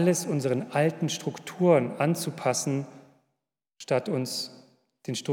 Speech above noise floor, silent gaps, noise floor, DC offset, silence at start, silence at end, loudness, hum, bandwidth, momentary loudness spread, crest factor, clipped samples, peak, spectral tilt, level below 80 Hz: 57 dB; none; -84 dBFS; under 0.1%; 0 s; 0 s; -27 LUFS; none; 18 kHz; 13 LU; 18 dB; under 0.1%; -10 dBFS; -5 dB/octave; -84 dBFS